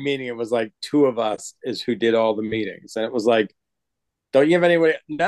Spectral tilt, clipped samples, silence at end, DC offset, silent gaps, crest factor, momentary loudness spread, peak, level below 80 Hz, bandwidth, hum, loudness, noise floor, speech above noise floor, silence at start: -5.5 dB/octave; under 0.1%; 0 s; under 0.1%; none; 16 dB; 12 LU; -4 dBFS; -66 dBFS; 12.5 kHz; none; -21 LUFS; -82 dBFS; 62 dB; 0 s